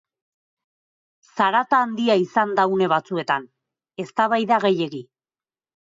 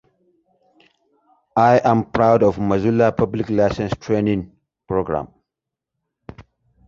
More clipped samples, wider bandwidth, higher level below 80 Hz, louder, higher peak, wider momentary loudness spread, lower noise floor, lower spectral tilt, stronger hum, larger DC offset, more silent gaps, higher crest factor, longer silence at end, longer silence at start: neither; about the same, 7.8 kHz vs 7.4 kHz; second, -74 dBFS vs -46 dBFS; second, -21 LUFS vs -18 LUFS; second, -6 dBFS vs -2 dBFS; about the same, 12 LU vs 11 LU; first, under -90 dBFS vs -84 dBFS; second, -6 dB/octave vs -8 dB/octave; neither; neither; neither; about the same, 16 dB vs 18 dB; first, 0.85 s vs 0.45 s; second, 1.35 s vs 1.55 s